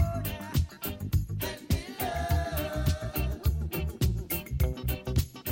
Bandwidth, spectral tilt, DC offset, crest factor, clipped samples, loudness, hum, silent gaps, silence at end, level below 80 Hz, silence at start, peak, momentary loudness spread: 17 kHz; -5.5 dB/octave; under 0.1%; 16 dB; under 0.1%; -31 LUFS; none; none; 0 s; -34 dBFS; 0 s; -14 dBFS; 4 LU